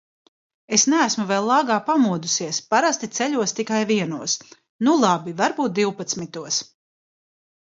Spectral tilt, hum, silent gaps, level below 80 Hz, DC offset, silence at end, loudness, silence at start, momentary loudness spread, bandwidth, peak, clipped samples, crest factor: -3 dB/octave; none; 4.69-4.79 s; -70 dBFS; under 0.1%; 1.15 s; -21 LUFS; 0.7 s; 7 LU; 7.8 kHz; -2 dBFS; under 0.1%; 20 dB